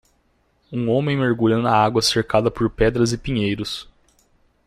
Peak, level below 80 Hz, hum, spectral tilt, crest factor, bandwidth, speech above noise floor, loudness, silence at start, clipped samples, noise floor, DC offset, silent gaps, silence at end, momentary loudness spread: -4 dBFS; -40 dBFS; none; -5.5 dB/octave; 18 dB; 15 kHz; 44 dB; -20 LUFS; 0.7 s; under 0.1%; -63 dBFS; under 0.1%; none; 0.85 s; 9 LU